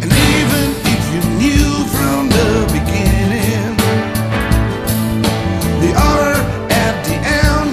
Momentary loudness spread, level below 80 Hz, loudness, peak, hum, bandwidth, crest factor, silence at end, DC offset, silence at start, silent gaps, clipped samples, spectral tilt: 5 LU; -22 dBFS; -14 LUFS; 0 dBFS; none; 14.5 kHz; 14 dB; 0 s; under 0.1%; 0 s; none; under 0.1%; -5 dB/octave